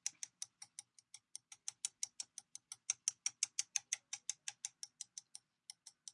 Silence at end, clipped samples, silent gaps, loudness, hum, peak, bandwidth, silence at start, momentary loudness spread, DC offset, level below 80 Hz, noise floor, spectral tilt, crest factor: 0.05 s; under 0.1%; none; -44 LUFS; none; -18 dBFS; 11.5 kHz; 0.05 s; 17 LU; under 0.1%; under -90 dBFS; -65 dBFS; 4.5 dB/octave; 30 dB